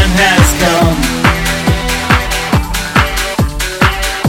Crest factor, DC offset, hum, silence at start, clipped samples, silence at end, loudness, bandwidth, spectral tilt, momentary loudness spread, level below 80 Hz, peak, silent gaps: 12 dB; under 0.1%; none; 0 s; 0.2%; 0 s; -11 LUFS; 18.5 kHz; -4 dB/octave; 6 LU; -20 dBFS; 0 dBFS; none